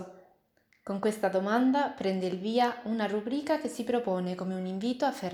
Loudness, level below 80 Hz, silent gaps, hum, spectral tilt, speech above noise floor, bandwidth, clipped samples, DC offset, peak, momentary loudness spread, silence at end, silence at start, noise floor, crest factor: -30 LUFS; -74 dBFS; none; none; -6 dB/octave; 40 dB; 16 kHz; under 0.1%; under 0.1%; -14 dBFS; 7 LU; 0 s; 0 s; -69 dBFS; 16 dB